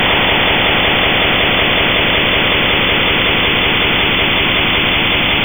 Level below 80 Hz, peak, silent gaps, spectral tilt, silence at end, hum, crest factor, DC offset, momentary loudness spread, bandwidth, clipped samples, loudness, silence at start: -28 dBFS; 0 dBFS; none; -10 dB/octave; 0 s; none; 12 dB; under 0.1%; 1 LU; over 20 kHz; under 0.1%; -11 LUFS; 0 s